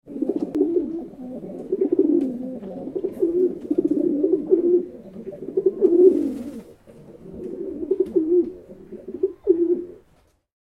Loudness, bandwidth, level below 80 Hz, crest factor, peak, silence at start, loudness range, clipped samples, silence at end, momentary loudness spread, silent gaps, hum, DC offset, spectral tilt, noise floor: -22 LUFS; 2.7 kHz; -58 dBFS; 20 dB; -2 dBFS; 0.05 s; 4 LU; under 0.1%; 0.7 s; 18 LU; none; none; under 0.1%; -10 dB/octave; -60 dBFS